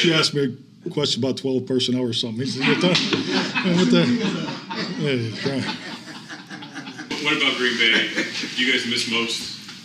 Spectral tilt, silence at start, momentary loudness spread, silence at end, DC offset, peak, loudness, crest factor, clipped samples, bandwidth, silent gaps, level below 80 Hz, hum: -4 dB/octave; 0 s; 17 LU; 0 s; under 0.1%; -4 dBFS; -21 LUFS; 18 dB; under 0.1%; 14.5 kHz; none; -66 dBFS; none